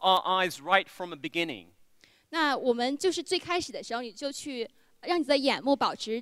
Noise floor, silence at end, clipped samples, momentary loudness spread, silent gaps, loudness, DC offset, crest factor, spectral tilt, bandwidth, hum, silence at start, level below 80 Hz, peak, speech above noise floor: -61 dBFS; 0 s; under 0.1%; 12 LU; none; -29 LUFS; under 0.1%; 22 dB; -3 dB/octave; 16 kHz; none; 0 s; -70 dBFS; -6 dBFS; 33 dB